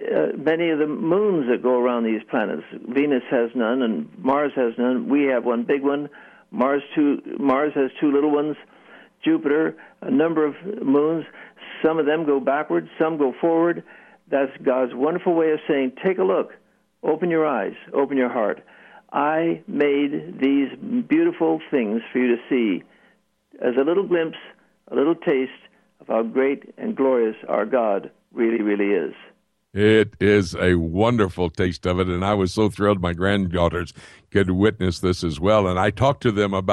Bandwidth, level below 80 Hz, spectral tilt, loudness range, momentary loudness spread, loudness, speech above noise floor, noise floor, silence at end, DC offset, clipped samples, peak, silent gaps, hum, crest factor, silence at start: 11.5 kHz; -50 dBFS; -7 dB/octave; 3 LU; 7 LU; -21 LUFS; 40 dB; -61 dBFS; 0 s; under 0.1%; under 0.1%; -4 dBFS; none; none; 16 dB; 0 s